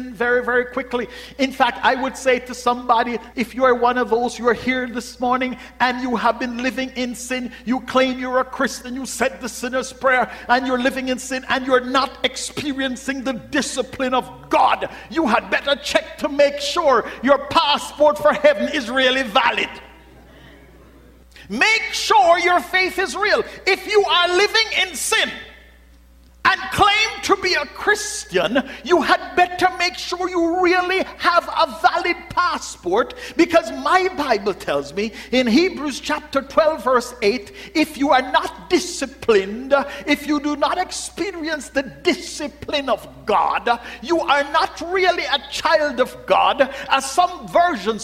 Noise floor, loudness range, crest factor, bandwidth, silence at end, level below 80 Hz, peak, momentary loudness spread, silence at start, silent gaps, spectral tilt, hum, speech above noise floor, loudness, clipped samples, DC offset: -48 dBFS; 4 LU; 18 dB; 16 kHz; 0 s; -48 dBFS; -2 dBFS; 9 LU; 0 s; none; -3 dB/octave; none; 29 dB; -19 LUFS; under 0.1%; under 0.1%